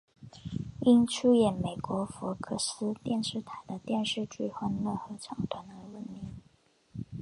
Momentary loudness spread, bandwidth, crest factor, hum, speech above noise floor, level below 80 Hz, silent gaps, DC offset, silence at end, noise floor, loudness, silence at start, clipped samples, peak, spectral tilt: 20 LU; 11.5 kHz; 20 dB; none; 35 dB; -60 dBFS; none; under 0.1%; 0 s; -65 dBFS; -31 LUFS; 0.2 s; under 0.1%; -12 dBFS; -5.5 dB/octave